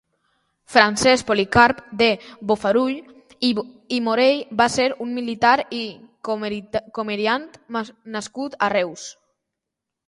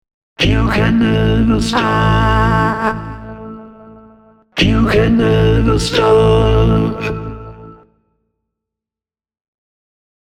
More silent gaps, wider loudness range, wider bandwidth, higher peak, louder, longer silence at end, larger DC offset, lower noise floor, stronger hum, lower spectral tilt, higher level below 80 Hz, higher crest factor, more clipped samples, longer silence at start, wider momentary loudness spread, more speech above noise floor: neither; about the same, 7 LU vs 7 LU; about the same, 11.5 kHz vs 12 kHz; about the same, 0 dBFS vs 0 dBFS; second, -20 LUFS vs -13 LUFS; second, 0.95 s vs 2.6 s; neither; second, -84 dBFS vs under -90 dBFS; neither; second, -3.5 dB/octave vs -6.5 dB/octave; second, -52 dBFS vs -24 dBFS; first, 22 dB vs 14 dB; neither; first, 0.7 s vs 0.4 s; second, 14 LU vs 18 LU; second, 63 dB vs over 78 dB